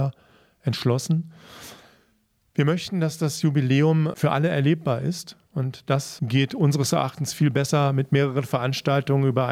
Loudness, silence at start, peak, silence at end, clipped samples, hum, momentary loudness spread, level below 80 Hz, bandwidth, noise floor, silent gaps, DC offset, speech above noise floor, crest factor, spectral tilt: -23 LUFS; 0 s; -6 dBFS; 0 s; under 0.1%; none; 9 LU; -64 dBFS; 15.5 kHz; -66 dBFS; none; under 0.1%; 44 dB; 16 dB; -6 dB/octave